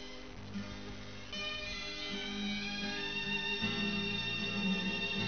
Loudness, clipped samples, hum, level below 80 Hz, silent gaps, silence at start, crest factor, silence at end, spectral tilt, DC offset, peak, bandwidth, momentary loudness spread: -36 LUFS; under 0.1%; none; -56 dBFS; none; 0 s; 16 dB; 0 s; -2.5 dB/octave; 0.3%; -22 dBFS; 6.6 kHz; 12 LU